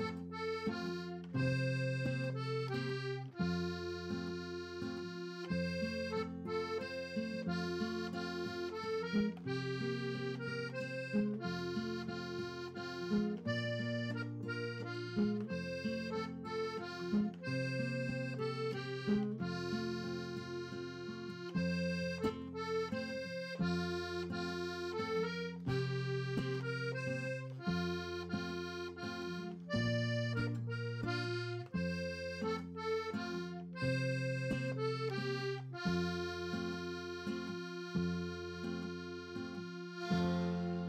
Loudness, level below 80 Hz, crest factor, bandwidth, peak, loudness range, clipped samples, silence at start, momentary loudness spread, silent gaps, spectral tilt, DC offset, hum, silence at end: -40 LUFS; -66 dBFS; 16 dB; 13.5 kHz; -24 dBFS; 2 LU; under 0.1%; 0 s; 7 LU; none; -6.5 dB/octave; under 0.1%; none; 0 s